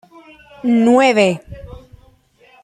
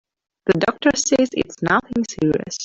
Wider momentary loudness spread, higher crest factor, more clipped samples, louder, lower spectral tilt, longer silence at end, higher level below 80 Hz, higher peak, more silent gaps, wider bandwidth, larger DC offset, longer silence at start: first, 23 LU vs 6 LU; about the same, 16 dB vs 16 dB; neither; first, -14 LUFS vs -20 LUFS; first, -5.5 dB/octave vs -4 dB/octave; first, 0.9 s vs 0 s; about the same, -46 dBFS vs -50 dBFS; about the same, -2 dBFS vs -4 dBFS; neither; first, 11 kHz vs 8.4 kHz; neither; first, 0.65 s vs 0.45 s